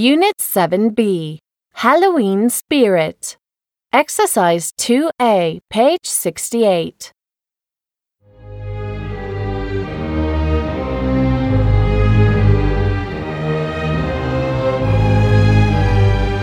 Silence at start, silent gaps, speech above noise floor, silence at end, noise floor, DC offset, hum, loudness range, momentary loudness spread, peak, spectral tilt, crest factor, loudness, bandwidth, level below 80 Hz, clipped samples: 0 s; none; 74 dB; 0 s; -89 dBFS; under 0.1%; none; 7 LU; 12 LU; 0 dBFS; -5.5 dB/octave; 16 dB; -16 LUFS; 18.5 kHz; -26 dBFS; under 0.1%